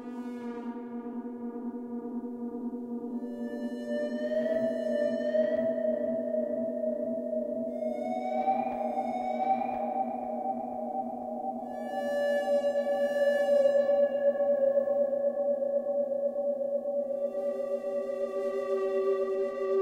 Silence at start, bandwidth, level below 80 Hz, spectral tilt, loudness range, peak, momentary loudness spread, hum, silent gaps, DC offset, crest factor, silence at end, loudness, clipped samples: 0 s; 10.5 kHz; -74 dBFS; -6 dB/octave; 7 LU; -16 dBFS; 11 LU; none; none; under 0.1%; 16 dB; 0 s; -31 LUFS; under 0.1%